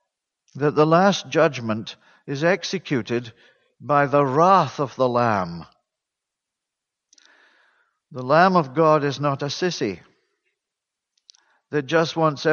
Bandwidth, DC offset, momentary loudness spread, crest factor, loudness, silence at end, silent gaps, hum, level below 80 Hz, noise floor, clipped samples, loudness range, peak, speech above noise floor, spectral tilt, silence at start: 7.2 kHz; under 0.1%; 16 LU; 20 dB; -20 LUFS; 0 s; none; none; -66 dBFS; -84 dBFS; under 0.1%; 6 LU; -2 dBFS; 64 dB; -6 dB/octave; 0.55 s